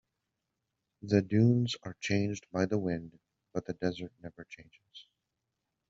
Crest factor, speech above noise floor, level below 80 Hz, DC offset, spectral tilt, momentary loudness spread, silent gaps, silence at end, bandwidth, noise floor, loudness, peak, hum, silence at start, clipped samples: 22 dB; 53 dB; -66 dBFS; under 0.1%; -6.5 dB/octave; 24 LU; none; 0.9 s; 7.6 kHz; -85 dBFS; -32 LUFS; -12 dBFS; none; 1.05 s; under 0.1%